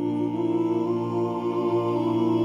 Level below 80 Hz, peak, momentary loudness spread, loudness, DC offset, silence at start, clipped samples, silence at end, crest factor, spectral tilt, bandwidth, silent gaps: -64 dBFS; -12 dBFS; 3 LU; -25 LUFS; under 0.1%; 0 s; under 0.1%; 0 s; 12 dB; -9 dB/octave; 7.2 kHz; none